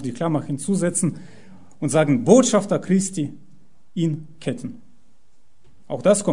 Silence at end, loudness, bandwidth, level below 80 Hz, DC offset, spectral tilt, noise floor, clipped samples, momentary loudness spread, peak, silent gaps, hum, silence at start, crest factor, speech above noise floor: 0 s; -21 LUFS; 11 kHz; -62 dBFS; 1%; -5.5 dB/octave; -62 dBFS; under 0.1%; 17 LU; 0 dBFS; none; none; 0 s; 22 dB; 42 dB